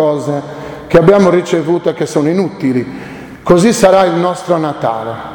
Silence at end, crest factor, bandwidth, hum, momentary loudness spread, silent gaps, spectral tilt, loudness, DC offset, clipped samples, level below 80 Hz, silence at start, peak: 0 s; 12 dB; 19 kHz; none; 16 LU; none; -6 dB/octave; -12 LUFS; under 0.1%; 0.3%; -42 dBFS; 0 s; 0 dBFS